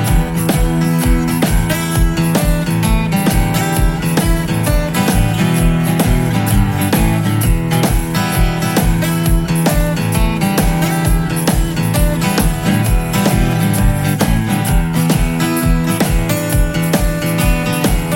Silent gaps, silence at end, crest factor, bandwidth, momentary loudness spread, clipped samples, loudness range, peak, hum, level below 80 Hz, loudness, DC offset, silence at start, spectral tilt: none; 0 s; 14 dB; 16.5 kHz; 2 LU; under 0.1%; 1 LU; 0 dBFS; none; -18 dBFS; -15 LUFS; under 0.1%; 0 s; -5.5 dB/octave